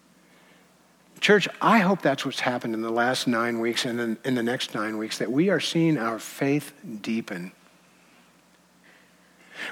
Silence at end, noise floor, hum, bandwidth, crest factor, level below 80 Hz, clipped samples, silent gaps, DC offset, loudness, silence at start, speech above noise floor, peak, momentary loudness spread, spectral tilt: 0 s; -59 dBFS; none; 17 kHz; 22 dB; -78 dBFS; under 0.1%; none; under 0.1%; -25 LUFS; 1.2 s; 34 dB; -6 dBFS; 12 LU; -5 dB/octave